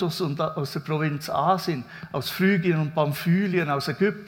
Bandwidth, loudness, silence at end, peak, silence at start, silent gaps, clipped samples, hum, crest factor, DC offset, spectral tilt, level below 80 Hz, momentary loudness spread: 17.5 kHz; -25 LUFS; 0 s; -8 dBFS; 0 s; none; under 0.1%; none; 16 dB; under 0.1%; -6.5 dB/octave; -64 dBFS; 8 LU